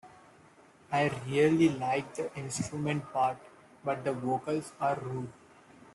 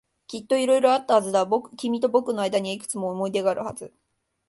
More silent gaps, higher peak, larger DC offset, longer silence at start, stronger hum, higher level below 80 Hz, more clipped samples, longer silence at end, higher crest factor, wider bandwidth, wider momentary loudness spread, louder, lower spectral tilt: neither; second, -14 dBFS vs -6 dBFS; neither; second, 0.05 s vs 0.3 s; neither; about the same, -68 dBFS vs -70 dBFS; neither; about the same, 0.6 s vs 0.6 s; about the same, 18 dB vs 18 dB; about the same, 12 kHz vs 11.5 kHz; about the same, 12 LU vs 12 LU; second, -31 LUFS vs -23 LUFS; first, -6 dB/octave vs -4.5 dB/octave